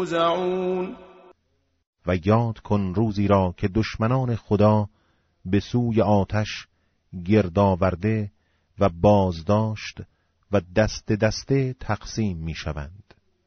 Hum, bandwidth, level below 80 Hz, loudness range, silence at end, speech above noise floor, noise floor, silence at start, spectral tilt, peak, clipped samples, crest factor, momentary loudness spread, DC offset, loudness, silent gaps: none; 7 kHz; -44 dBFS; 3 LU; 0.45 s; 48 dB; -70 dBFS; 0 s; -6.5 dB/octave; -6 dBFS; under 0.1%; 18 dB; 14 LU; under 0.1%; -23 LUFS; 1.87-1.93 s